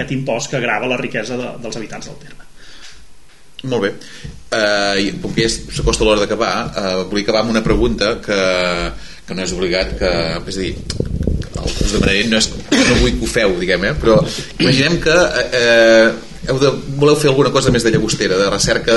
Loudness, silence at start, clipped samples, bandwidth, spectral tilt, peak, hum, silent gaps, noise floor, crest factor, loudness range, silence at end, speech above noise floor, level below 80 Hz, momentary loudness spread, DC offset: -15 LUFS; 0 s; under 0.1%; 11.5 kHz; -4.5 dB/octave; 0 dBFS; none; none; -43 dBFS; 16 dB; 10 LU; 0 s; 28 dB; -28 dBFS; 11 LU; 2%